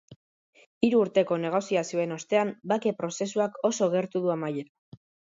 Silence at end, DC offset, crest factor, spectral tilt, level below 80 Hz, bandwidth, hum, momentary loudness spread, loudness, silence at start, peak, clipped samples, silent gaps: 0.65 s; under 0.1%; 20 dB; -5.5 dB/octave; -72 dBFS; 7.8 kHz; none; 7 LU; -27 LUFS; 0.1 s; -8 dBFS; under 0.1%; 0.16-0.53 s, 0.66-0.81 s